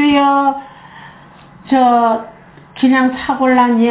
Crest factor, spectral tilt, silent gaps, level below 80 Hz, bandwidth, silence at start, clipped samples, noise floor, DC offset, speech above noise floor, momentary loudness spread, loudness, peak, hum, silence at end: 12 dB; -9 dB/octave; none; -50 dBFS; 4 kHz; 0 s; under 0.1%; -40 dBFS; under 0.1%; 28 dB; 9 LU; -13 LUFS; -2 dBFS; none; 0 s